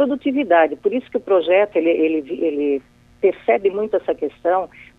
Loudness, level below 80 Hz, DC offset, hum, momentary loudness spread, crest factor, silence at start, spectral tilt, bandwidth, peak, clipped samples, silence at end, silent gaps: -19 LUFS; -58 dBFS; under 0.1%; none; 7 LU; 16 dB; 0 s; -7 dB/octave; 4.2 kHz; -2 dBFS; under 0.1%; 0.35 s; none